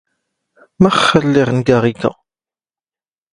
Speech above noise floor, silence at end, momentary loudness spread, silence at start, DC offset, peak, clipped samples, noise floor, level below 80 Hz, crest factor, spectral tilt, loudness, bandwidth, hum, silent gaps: over 77 dB; 1.2 s; 8 LU; 0.8 s; under 0.1%; 0 dBFS; under 0.1%; under -90 dBFS; -48 dBFS; 16 dB; -6 dB/octave; -13 LUFS; 11 kHz; none; none